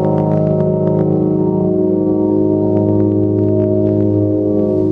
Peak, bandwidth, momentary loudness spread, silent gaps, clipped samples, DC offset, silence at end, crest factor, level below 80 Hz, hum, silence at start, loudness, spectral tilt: -2 dBFS; 3.1 kHz; 1 LU; none; under 0.1%; under 0.1%; 0 s; 10 dB; -44 dBFS; none; 0 s; -14 LUFS; -13 dB/octave